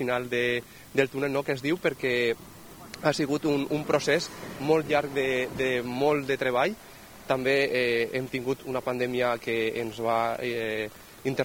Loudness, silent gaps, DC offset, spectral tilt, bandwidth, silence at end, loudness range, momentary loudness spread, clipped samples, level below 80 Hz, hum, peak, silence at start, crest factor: -27 LUFS; none; under 0.1%; -5 dB/octave; 20 kHz; 0 s; 2 LU; 9 LU; under 0.1%; -60 dBFS; none; -6 dBFS; 0 s; 20 dB